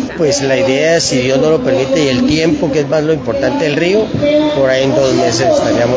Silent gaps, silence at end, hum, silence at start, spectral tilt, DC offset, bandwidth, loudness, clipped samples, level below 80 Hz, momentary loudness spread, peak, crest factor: none; 0 s; none; 0 s; -5 dB/octave; under 0.1%; 8 kHz; -12 LUFS; under 0.1%; -38 dBFS; 3 LU; 0 dBFS; 12 dB